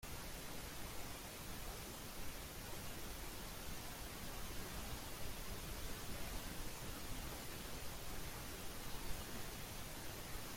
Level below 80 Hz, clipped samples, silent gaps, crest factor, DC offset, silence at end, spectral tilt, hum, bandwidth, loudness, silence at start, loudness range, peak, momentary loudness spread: -54 dBFS; under 0.1%; none; 16 dB; under 0.1%; 0 s; -3 dB/octave; none; 16.5 kHz; -49 LUFS; 0 s; 1 LU; -30 dBFS; 2 LU